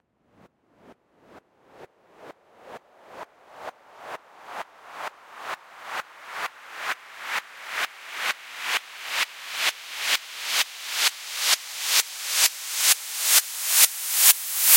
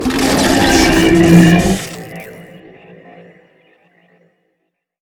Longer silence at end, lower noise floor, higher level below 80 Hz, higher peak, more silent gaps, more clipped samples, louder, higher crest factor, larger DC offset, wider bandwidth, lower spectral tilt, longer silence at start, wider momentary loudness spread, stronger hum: second, 0 s vs 2.6 s; second, -59 dBFS vs -70 dBFS; second, -82 dBFS vs -30 dBFS; about the same, -2 dBFS vs 0 dBFS; neither; second, under 0.1% vs 0.2%; second, -22 LUFS vs -10 LUFS; first, 26 dB vs 14 dB; neither; second, 16.5 kHz vs 18.5 kHz; second, 4 dB/octave vs -5 dB/octave; first, 0.9 s vs 0 s; about the same, 23 LU vs 23 LU; neither